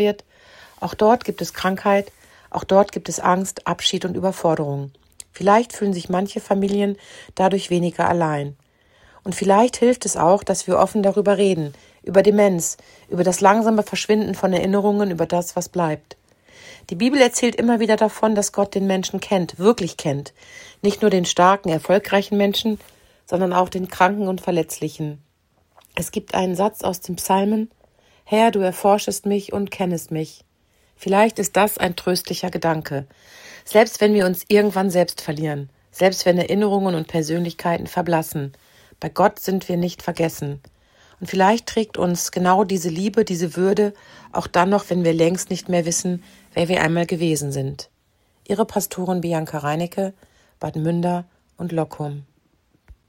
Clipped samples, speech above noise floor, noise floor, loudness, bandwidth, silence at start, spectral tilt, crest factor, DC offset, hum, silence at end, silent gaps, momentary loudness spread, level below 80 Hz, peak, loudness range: under 0.1%; 44 dB; -63 dBFS; -20 LUFS; 16.5 kHz; 0 s; -5 dB/octave; 20 dB; under 0.1%; none; 0.85 s; none; 13 LU; -56 dBFS; 0 dBFS; 5 LU